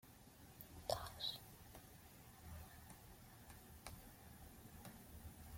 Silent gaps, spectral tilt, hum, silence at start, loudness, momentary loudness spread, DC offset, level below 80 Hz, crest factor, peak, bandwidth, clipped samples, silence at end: none; -3.5 dB/octave; none; 0 s; -54 LUFS; 15 LU; under 0.1%; -66 dBFS; 30 dB; -26 dBFS; 16.5 kHz; under 0.1%; 0 s